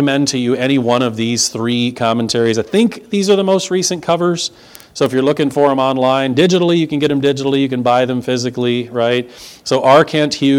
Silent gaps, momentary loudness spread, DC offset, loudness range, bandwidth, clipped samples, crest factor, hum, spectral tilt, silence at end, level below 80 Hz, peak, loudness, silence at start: none; 6 LU; under 0.1%; 2 LU; 16.5 kHz; under 0.1%; 14 dB; none; -4.5 dB/octave; 0 s; -56 dBFS; 0 dBFS; -14 LUFS; 0 s